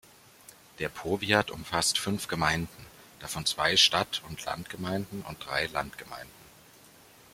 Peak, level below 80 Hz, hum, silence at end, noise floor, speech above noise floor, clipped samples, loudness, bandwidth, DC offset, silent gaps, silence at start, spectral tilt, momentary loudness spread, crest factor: -6 dBFS; -58 dBFS; none; 0.85 s; -55 dBFS; 25 dB; under 0.1%; -28 LUFS; 16.5 kHz; under 0.1%; none; 0.8 s; -2.5 dB/octave; 19 LU; 26 dB